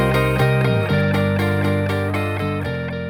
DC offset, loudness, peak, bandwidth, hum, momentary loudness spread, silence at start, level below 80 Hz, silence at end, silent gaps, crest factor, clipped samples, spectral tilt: under 0.1%; -19 LUFS; -6 dBFS; over 20 kHz; 50 Hz at -45 dBFS; 6 LU; 0 s; -38 dBFS; 0 s; none; 12 dB; under 0.1%; -7 dB/octave